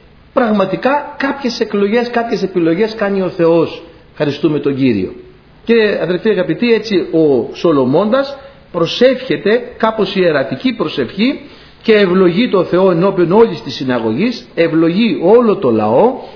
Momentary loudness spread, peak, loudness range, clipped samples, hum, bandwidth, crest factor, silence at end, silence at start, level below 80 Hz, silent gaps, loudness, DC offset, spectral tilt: 8 LU; 0 dBFS; 3 LU; under 0.1%; none; 5.4 kHz; 14 dB; 0 s; 0.35 s; -48 dBFS; none; -13 LUFS; under 0.1%; -7 dB/octave